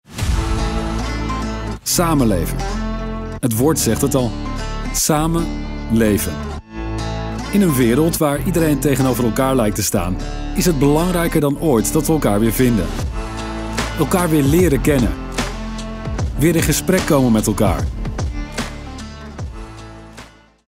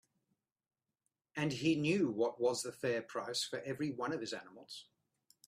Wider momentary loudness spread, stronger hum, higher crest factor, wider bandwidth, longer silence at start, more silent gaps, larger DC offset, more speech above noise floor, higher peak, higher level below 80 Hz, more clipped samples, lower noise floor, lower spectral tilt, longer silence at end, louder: about the same, 13 LU vs 15 LU; neither; about the same, 14 dB vs 18 dB; first, 16.5 kHz vs 14.5 kHz; second, 0.1 s vs 1.35 s; neither; neither; second, 26 dB vs 51 dB; first, -4 dBFS vs -20 dBFS; first, -26 dBFS vs -78 dBFS; neither; second, -41 dBFS vs -88 dBFS; about the same, -5.5 dB/octave vs -4.5 dB/octave; second, 0.45 s vs 0.65 s; first, -18 LUFS vs -37 LUFS